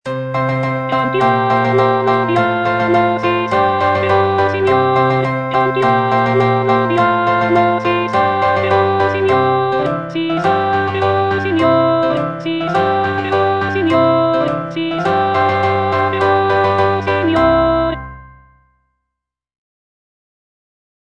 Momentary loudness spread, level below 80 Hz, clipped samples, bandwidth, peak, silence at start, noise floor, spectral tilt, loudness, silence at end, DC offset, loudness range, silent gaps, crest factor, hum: 4 LU; -44 dBFS; under 0.1%; 9.2 kHz; 0 dBFS; 0.05 s; -79 dBFS; -7.5 dB/octave; -14 LUFS; 2.8 s; 0.3%; 2 LU; none; 14 dB; none